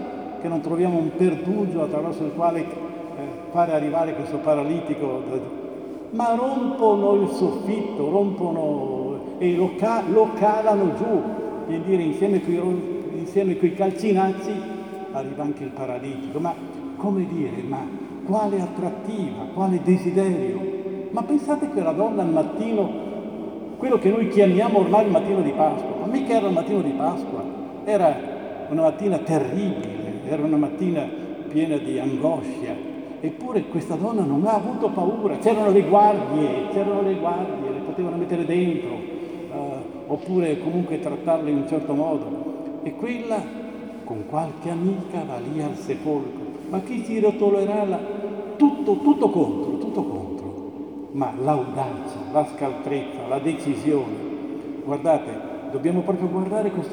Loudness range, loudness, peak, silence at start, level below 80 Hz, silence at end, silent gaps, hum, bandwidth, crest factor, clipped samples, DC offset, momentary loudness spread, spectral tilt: 6 LU; -23 LUFS; -4 dBFS; 0 s; -62 dBFS; 0 s; none; none; 11 kHz; 18 dB; under 0.1%; under 0.1%; 12 LU; -8 dB/octave